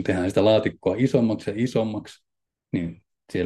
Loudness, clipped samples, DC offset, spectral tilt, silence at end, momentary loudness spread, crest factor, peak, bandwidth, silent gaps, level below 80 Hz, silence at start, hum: -23 LUFS; under 0.1%; under 0.1%; -7 dB/octave; 0 s; 12 LU; 16 dB; -8 dBFS; 12.5 kHz; none; -58 dBFS; 0 s; none